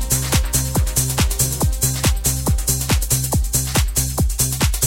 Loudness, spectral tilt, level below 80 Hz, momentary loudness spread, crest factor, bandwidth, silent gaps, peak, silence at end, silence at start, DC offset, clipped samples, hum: -18 LUFS; -3.5 dB/octave; -22 dBFS; 1 LU; 16 dB; 16.5 kHz; none; -2 dBFS; 0 s; 0 s; under 0.1%; under 0.1%; none